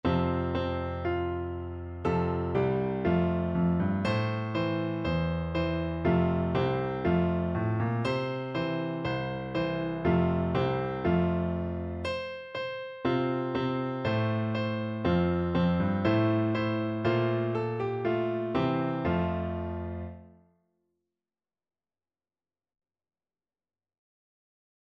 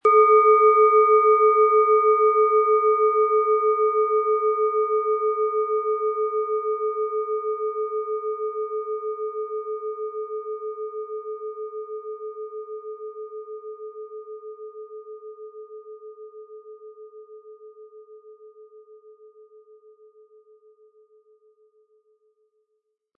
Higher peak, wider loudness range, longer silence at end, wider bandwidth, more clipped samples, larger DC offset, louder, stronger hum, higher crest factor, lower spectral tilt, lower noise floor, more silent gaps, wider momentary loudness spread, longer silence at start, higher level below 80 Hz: second, -14 dBFS vs -6 dBFS; second, 4 LU vs 24 LU; first, 4.65 s vs 4.25 s; first, 7.4 kHz vs 2.4 kHz; neither; neither; second, -29 LUFS vs -21 LUFS; neither; about the same, 16 dB vs 18 dB; first, -9 dB/octave vs -5.5 dB/octave; first, under -90 dBFS vs -76 dBFS; neither; second, 7 LU vs 24 LU; about the same, 0.05 s vs 0.05 s; first, -48 dBFS vs under -90 dBFS